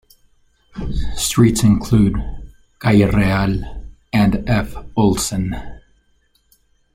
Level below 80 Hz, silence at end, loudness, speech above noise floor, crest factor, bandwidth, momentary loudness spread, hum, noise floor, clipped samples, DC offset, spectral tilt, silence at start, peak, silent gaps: -30 dBFS; 1.15 s; -17 LUFS; 44 dB; 16 dB; 16 kHz; 17 LU; none; -60 dBFS; under 0.1%; under 0.1%; -5.5 dB/octave; 0.75 s; -2 dBFS; none